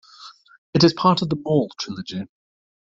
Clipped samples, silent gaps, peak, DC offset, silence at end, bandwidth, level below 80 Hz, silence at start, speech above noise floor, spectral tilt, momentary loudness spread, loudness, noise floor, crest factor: under 0.1%; 0.58-0.73 s; -2 dBFS; under 0.1%; 0.65 s; 7.8 kHz; -58 dBFS; 0.2 s; 25 dB; -6 dB/octave; 16 LU; -21 LUFS; -46 dBFS; 20 dB